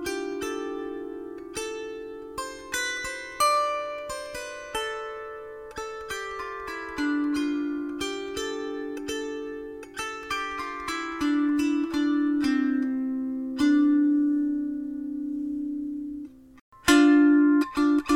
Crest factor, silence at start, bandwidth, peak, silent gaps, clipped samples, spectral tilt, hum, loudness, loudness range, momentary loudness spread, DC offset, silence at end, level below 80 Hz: 20 dB; 0 s; 16 kHz; -6 dBFS; 16.61-16.72 s; under 0.1%; -3 dB/octave; none; -27 LUFS; 8 LU; 15 LU; under 0.1%; 0 s; -56 dBFS